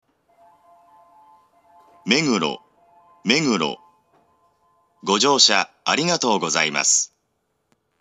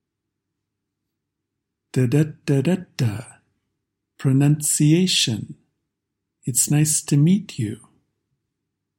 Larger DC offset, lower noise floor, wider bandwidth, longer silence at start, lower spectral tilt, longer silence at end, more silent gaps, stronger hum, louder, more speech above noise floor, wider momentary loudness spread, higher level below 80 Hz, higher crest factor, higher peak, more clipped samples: neither; second, -72 dBFS vs -81 dBFS; second, 12.5 kHz vs 16.5 kHz; about the same, 2.05 s vs 1.95 s; second, -2 dB/octave vs -4.5 dB/octave; second, 0.95 s vs 1.25 s; neither; neither; about the same, -19 LUFS vs -20 LUFS; second, 52 dB vs 61 dB; about the same, 15 LU vs 13 LU; second, -80 dBFS vs -62 dBFS; first, 24 dB vs 18 dB; first, 0 dBFS vs -4 dBFS; neither